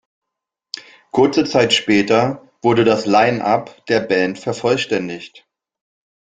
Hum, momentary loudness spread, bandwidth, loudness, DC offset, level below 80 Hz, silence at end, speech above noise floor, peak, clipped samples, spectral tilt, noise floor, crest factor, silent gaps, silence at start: none; 15 LU; 9.4 kHz; -16 LUFS; under 0.1%; -56 dBFS; 1.05 s; 66 dB; -2 dBFS; under 0.1%; -5 dB/octave; -82 dBFS; 16 dB; none; 0.75 s